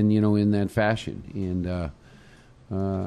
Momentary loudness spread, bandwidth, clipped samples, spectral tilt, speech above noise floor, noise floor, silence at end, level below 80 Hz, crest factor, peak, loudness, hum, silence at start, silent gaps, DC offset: 13 LU; 12.5 kHz; under 0.1%; -8 dB/octave; 27 dB; -51 dBFS; 0 s; -48 dBFS; 16 dB; -8 dBFS; -26 LUFS; none; 0 s; none; under 0.1%